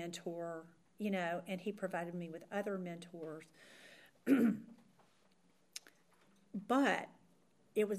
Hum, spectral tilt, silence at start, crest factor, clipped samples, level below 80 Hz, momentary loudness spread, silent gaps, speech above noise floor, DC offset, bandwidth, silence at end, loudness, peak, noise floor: none; -5.5 dB/octave; 0 s; 22 dB; under 0.1%; -90 dBFS; 21 LU; none; 35 dB; under 0.1%; 15.5 kHz; 0 s; -39 LUFS; -18 dBFS; -73 dBFS